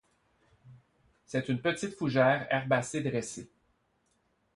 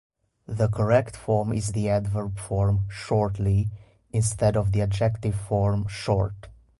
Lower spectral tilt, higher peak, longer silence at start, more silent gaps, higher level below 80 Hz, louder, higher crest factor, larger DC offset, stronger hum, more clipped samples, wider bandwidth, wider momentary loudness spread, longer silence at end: about the same, -5.5 dB/octave vs -6.5 dB/octave; second, -12 dBFS vs -8 dBFS; first, 0.65 s vs 0.5 s; neither; second, -68 dBFS vs -40 dBFS; second, -30 LUFS vs -25 LUFS; first, 22 dB vs 16 dB; neither; neither; neither; about the same, 11.5 kHz vs 11.5 kHz; first, 10 LU vs 7 LU; first, 1.1 s vs 0.25 s